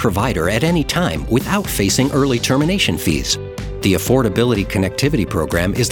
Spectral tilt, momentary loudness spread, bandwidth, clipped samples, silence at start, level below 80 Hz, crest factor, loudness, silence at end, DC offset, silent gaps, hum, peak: -5 dB/octave; 4 LU; 19.5 kHz; under 0.1%; 0 s; -32 dBFS; 16 dB; -17 LUFS; 0 s; under 0.1%; none; none; -2 dBFS